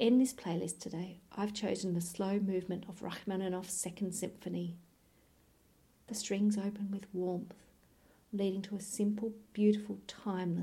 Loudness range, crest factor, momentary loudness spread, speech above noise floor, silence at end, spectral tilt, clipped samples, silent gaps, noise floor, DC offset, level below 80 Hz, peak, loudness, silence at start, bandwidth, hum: 4 LU; 18 dB; 11 LU; 32 dB; 0 s; -5.5 dB/octave; under 0.1%; none; -68 dBFS; under 0.1%; -72 dBFS; -18 dBFS; -37 LUFS; 0 s; 16 kHz; none